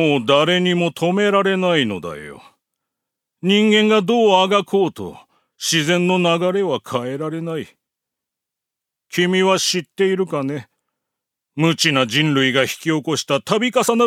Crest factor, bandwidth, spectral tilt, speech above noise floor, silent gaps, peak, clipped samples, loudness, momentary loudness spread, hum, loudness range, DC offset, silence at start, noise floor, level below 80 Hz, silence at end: 18 dB; 16.5 kHz; -4.5 dB/octave; 67 dB; none; 0 dBFS; under 0.1%; -17 LUFS; 12 LU; none; 5 LU; under 0.1%; 0 s; -84 dBFS; -66 dBFS; 0 s